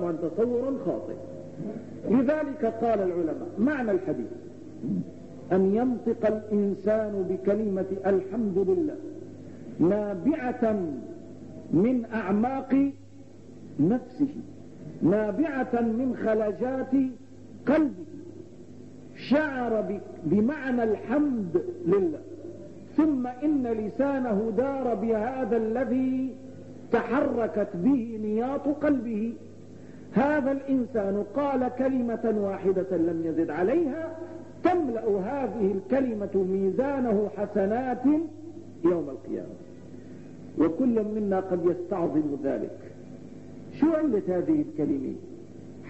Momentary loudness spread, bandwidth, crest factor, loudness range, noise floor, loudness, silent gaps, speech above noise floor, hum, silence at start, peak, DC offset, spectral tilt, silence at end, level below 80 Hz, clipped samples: 18 LU; 8.2 kHz; 16 dB; 2 LU; -48 dBFS; -27 LUFS; none; 22 dB; none; 0 s; -10 dBFS; 0.3%; -9 dB/octave; 0 s; -60 dBFS; under 0.1%